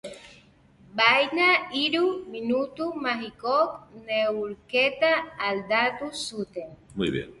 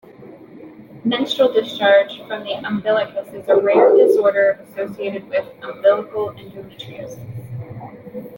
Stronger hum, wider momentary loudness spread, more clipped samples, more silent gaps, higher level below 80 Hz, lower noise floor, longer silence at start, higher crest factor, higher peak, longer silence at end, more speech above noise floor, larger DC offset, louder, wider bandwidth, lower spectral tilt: neither; second, 14 LU vs 21 LU; neither; neither; about the same, -60 dBFS vs -62 dBFS; first, -56 dBFS vs -41 dBFS; second, 0.05 s vs 0.2 s; first, 22 dB vs 16 dB; about the same, -4 dBFS vs -2 dBFS; about the same, 0.05 s vs 0 s; first, 30 dB vs 23 dB; neither; second, -25 LUFS vs -17 LUFS; second, 11.5 kHz vs 17 kHz; second, -4 dB/octave vs -6 dB/octave